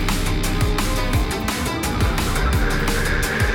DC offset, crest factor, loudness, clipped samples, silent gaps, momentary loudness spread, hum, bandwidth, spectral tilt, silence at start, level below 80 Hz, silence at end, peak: under 0.1%; 12 dB; -21 LUFS; under 0.1%; none; 2 LU; none; 18.5 kHz; -4.5 dB/octave; 0 s; -24 dBFS; 0 s; -6 dBFS